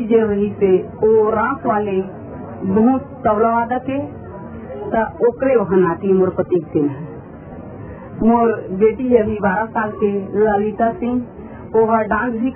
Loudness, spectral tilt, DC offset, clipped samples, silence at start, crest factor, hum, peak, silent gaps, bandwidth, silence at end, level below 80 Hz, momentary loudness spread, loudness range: -17 LUFS; -12.5 dB/octave; under 0.1%; under 0.1%; 0 s; 16 dB; none; 0 dBFS; none; 3.3 kHz; 0 s; -44 dBFS; 18 LU; 2 LU